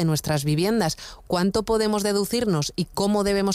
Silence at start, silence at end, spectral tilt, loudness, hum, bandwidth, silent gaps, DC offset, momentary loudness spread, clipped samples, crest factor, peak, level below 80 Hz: 0 s; 0 s; -5 dB/octave; -23 LUFS; none; 16 kHz; none; under 0.1%; 5 LU; under 0.1%; 12 dB; -10 dBFS; -46 dBFS